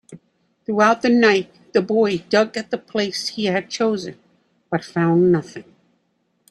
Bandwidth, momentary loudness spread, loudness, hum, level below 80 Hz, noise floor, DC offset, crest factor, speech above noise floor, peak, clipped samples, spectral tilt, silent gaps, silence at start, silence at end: 12 kHz; 12 LU; -19 LUFS; none; -62 dBFS; -68 dBFS; under 0.1%; 18 dB; 49 dB; -2 dBFS; under 0.1%; -5.5 dB/octave; none; 0.1 s; 0.9 s